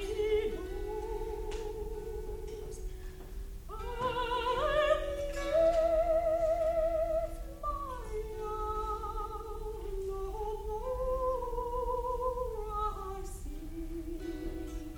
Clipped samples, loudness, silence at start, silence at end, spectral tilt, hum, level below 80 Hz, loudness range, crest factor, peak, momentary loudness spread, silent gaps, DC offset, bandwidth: under 0.1%; -35 LUFS; 0 s; 0 s; -5.5 dB/octave; none; -42 dBFS; 9 LU; 18 dB; -16 dBFS; 14 LU; none; under 0.1%; 19.5 kHz